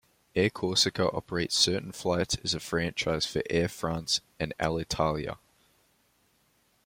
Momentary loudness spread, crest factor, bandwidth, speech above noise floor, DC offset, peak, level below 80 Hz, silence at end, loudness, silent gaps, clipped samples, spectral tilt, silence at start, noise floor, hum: 8 LU; 20 dB; 16.5 kHz; 40 dB; under 0.1%; -10 dBFS; -54 dBFS; 1.5 s; -29 LUFS; none; under 0.1%; -3.5 dB/octave; 0.35 s; -69 dBFS; none